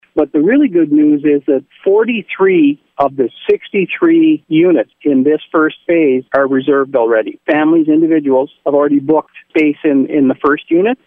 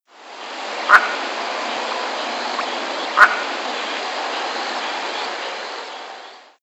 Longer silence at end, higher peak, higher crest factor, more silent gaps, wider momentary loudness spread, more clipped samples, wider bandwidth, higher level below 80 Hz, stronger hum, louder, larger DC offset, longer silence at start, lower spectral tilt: about the same, 0.1 s vs 0.2 s; about the same, 0 dBFS vs 0 dBFS; second, 12 dB vs 22 dB; neither; second, 5 LU vs 19 LU; neither; second, 3.7 kHz vs 16 kHz; first, -56 dBFS vs -72 dBFS; neither; first, -12 LUFS vs -20 LUFS; neither; about the same, 0.15 s vs 0.15 s; first, -9 dB/octave vs 0 dB/octave